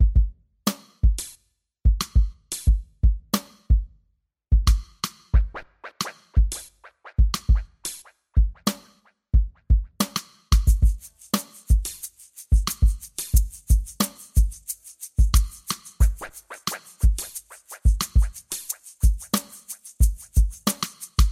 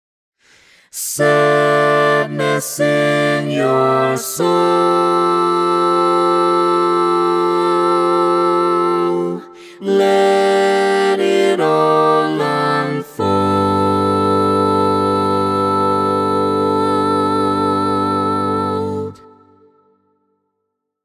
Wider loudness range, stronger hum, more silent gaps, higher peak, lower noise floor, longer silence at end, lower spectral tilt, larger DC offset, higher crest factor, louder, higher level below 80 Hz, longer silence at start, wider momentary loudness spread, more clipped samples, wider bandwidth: about the same, 2 LU vs 3 LU; neither; neither; second, -4 dBFS vs 0 dBFS; second, -70 dBFS vs -74 dBFS; second, 0 s vs 1.9 s; about the same, -4.5 dB/octave vs -5 dB/octave; neither; about the same, 18 dB vs 14 dB; second, -25 LUFS vs -15 LUFS; first, -24 dBFS vs -48 dBFS; second, 0 s vs 0.95 s; first, 13 LU vs 5 LU; neither; about the same, 16 kHz vs 16 kHz